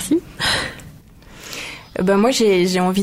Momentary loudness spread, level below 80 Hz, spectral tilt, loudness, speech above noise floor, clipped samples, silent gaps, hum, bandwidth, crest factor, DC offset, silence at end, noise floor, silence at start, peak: 17 LU; -46 dBFS; -4.5 dB/octave; -18 LUFS; 27 dB; under 0.1%; none; none; 16 kHz; 14 dB; under 0.1%; 0 s; -42 dBFS; 0 s; -4 dBFS